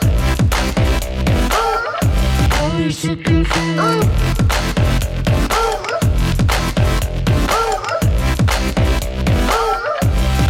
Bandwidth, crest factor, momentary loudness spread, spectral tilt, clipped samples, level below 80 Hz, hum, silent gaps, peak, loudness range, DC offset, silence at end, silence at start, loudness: 17 kHz; 12 dB; 3 LU; -5.5 dB/octave; under 0.1%; -20 dBFS; none; none; -4 dBFS; 1 LU; under 0.1%; 0 s; 0 s; -16 LUFS